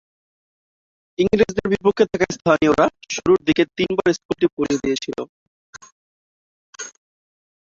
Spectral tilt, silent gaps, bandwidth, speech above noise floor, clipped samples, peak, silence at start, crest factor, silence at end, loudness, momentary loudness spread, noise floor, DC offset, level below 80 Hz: -5 dB/octave; 4.25-4.29 s, 4.53-4.57 s, 5.29-5.73 s, 5.92-6.73 s; 7.8 kHz; over 71 dB; under 0.1%; -2 dBFS; 1.2 s; 20 dB; 0.85 s; -19 LUFS; 18 LU; under -90 dBFS; under 0.1%; -50 dBFS